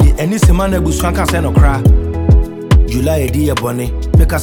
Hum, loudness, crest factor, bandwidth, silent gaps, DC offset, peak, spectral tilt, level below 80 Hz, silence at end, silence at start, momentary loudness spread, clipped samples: none; -13 LUFS; 10 dB; 18.5 kHz; none; under 0.1%; 0 dBFS; -6.5 dB/octave; -14 dBFS; 0 s; 0 s; 3 LU; under 0.1%